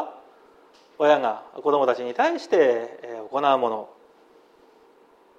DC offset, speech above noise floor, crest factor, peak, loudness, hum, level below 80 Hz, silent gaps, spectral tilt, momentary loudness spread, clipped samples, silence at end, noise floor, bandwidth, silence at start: under 0.1%; 34 dB; 18 dB; -6 dBFS; -23 LUFS; none; -78 dBFS; none; -4.5 dB/octave; 15 LU; under 0.1%; 1.5 s; -56 dBFS; 8.6 kHz; 0 s